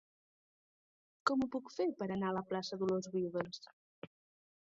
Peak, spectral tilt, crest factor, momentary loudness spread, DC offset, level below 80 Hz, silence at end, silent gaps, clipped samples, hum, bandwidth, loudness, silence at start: -18 dBFS; -5 dB/octave; 22 dB; 21 LU; under 0.1%; -76 dBFS; 0.6 s; 3.73-4.02 s; under 0.1%; none; 7.6 kHz; -38 LUFS; 1.25 s